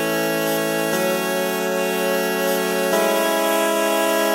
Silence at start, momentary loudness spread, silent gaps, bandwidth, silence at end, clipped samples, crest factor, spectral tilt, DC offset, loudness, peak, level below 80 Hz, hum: 0 s; 3 LU; none; 16 kHz; 0 s; under 0.1%; 14 dB; -3 dB/octave; under 0.1%; -20 LUFS; -6 dBFS; -70 dBFS; none